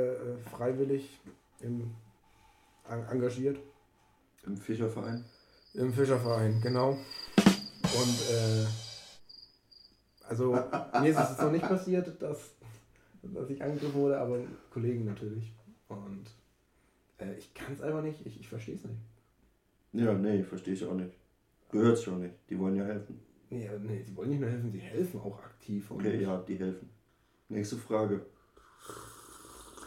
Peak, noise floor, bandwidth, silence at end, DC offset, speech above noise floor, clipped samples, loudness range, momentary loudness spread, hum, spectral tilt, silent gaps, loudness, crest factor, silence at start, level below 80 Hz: -8 dBFS; -70 dBFS; 16 kHz; 0 s; under 0.1%; 37 dB; under 0.1%; 10 LU; 19 LU; none; -6 dB/octave; none; -33 LUFS; 26 dB; 0 s; -66 dBFS